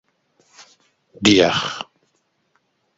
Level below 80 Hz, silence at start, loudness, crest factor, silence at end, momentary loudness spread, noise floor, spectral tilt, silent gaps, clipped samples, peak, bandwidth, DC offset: -54 dBFS; 1.2 s; -17 LUFS; 22 dB; 1.15 s; 19 LU; -68 dBFS; -4 dB/octave; none; under 0.1%; 0 dBFS; 7.8 kHz; under 0.1%